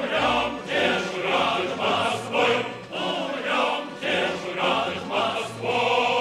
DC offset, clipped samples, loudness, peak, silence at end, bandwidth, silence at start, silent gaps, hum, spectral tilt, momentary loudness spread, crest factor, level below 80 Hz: under 0.1%; under 0.1%; -24 LUFS; -8 dBFS; 0 s; 16 kHz; 0 s; none; none; -3.5 dB/octave; 5 LU; 16 dB; -58 dBFS